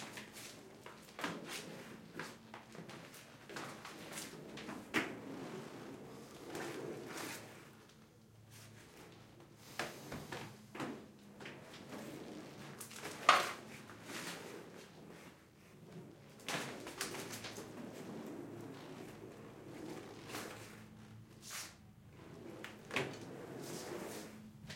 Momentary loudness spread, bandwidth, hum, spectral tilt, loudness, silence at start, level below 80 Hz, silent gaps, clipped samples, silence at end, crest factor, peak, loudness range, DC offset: 15 LU; 16.5 kHz; none; -3 dB/octave; -45 LUFS; 0 s; -76 dBFS; none; under 0.1%; 0 s; 36 dB; -10 dBFS; 11 LU; under 0.1%